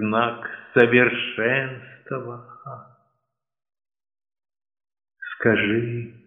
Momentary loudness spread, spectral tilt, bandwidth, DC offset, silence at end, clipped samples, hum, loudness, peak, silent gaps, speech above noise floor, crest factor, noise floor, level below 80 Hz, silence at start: 23 LU; -4 dB/octave; 3.9 kHz; under 0.1%; 0.15 s; under 0.1%; none; -21 LUFS; -2 dBFS; none; 58 dB; 22 dB; -79 dBFS; -66 dBFS; 0 s